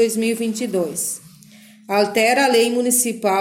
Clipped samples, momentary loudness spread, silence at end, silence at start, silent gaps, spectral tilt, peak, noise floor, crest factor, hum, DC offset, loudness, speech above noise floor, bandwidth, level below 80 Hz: under 0.1%; 8 LU; 0 s; 0 s; none; -2.5 dB/octave; -4 dBFS; -46 dBFS; 16 dB; none; under 0.1%; -18 LUFS; 28 dB; 17 kHz; -66 dBFS